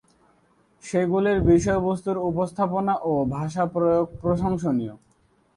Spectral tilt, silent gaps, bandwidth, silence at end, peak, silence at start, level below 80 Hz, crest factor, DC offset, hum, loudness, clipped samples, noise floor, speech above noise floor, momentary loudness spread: -7.5 dB/octave; none; 11.5 kHz; 0.6 s; -6 dBFS; 0.85 s; -44 dBFS; 18 dB; under 0.1%; none; -23 LUFS; under 0.1%; -63 dBFS; 40 dB; 7 LU